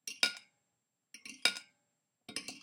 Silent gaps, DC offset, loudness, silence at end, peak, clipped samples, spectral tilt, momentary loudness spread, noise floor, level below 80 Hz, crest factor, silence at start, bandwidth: none; under 0.1%; -34 LUFS; 0.05 s; -8 dBFS; under 0.1%; 1 dB/octave; 18 LU; -85 dBFS; under -90 dBFS; 32 dB; 0.05 s; 16.5 kHz